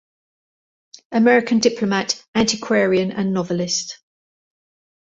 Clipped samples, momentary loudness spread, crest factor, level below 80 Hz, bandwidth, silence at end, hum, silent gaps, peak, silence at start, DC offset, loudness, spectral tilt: under 0.1%; 7 LU; 18 dB; -56 dBFS; 8 kHz; 1.2 s; none; 2.28-2.33 s; -2 dBFS; 1.1 s; under 0.1%; -19 LUFS; -4 dB/octave